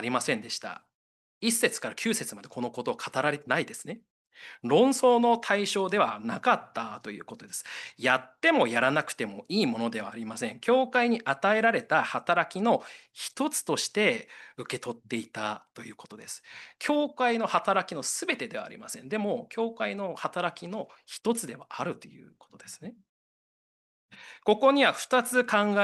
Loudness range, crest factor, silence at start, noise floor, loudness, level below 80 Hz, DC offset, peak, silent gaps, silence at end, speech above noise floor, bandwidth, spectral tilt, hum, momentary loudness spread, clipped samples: 8 LU; 20 dB; 0 s; under -90 dBFS; -28 LUFS; -78 dBFS; under 0.1%; -8 dBFS; 0.95-1.41 s, 4.10-4.25 s, 23.09-24.09 s; 0 s; over 62 dB; 12.5 kHz; -3.5 dB/octave; none; 18 LU; under 0.1%